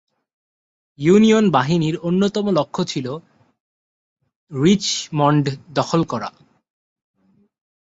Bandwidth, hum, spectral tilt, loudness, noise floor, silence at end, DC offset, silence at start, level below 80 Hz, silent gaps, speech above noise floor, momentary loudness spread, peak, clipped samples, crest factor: 8 kHz; none; -6 dB/octave; -18 LUFS; under -90 dBFS; 1.65 s; under 0.1%; 1 s; -56 dBFS; 3.60-4.16 s, 4.36-4.47 s; over 73 dB; 13 LU; -2 dBFS; under 0.1%; 18 dB